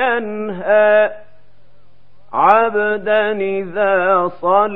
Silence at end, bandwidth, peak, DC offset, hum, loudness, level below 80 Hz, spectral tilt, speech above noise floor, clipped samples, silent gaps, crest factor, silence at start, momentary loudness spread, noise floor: 0 s; 4.1 kHz; 0 dBFS; 2%; none; -15 LUFS; -60 dBFS; -7.5 dB/octave; 39 dB; under 0.1%; none; 16 dB; 0 s; 9 LU; -54 dBFS